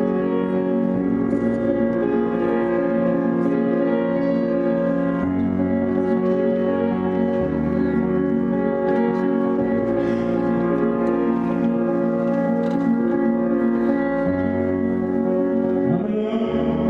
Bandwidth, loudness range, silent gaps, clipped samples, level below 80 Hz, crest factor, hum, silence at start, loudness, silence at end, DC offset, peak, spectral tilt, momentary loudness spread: 4.9 kHz; 0 LU; none; under 0.1%; -48 dBFS; 12 dB; none; 0 s; -21 LUFS; 0 s; under 0.1%; -8 dBFS; -10 dB/octave; 2 LU